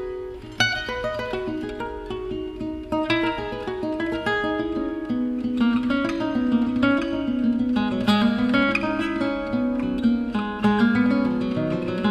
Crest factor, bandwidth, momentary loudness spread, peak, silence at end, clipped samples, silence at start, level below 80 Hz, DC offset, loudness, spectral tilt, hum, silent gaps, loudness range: 16 dB; 11.5 kHz; 10 LU; -6 dBFS; 0 s; under 0.1%; 0 s; -44 dBFS; under 0.1%; -23 LUFS; -6 dB/octave; none; none; 5 LU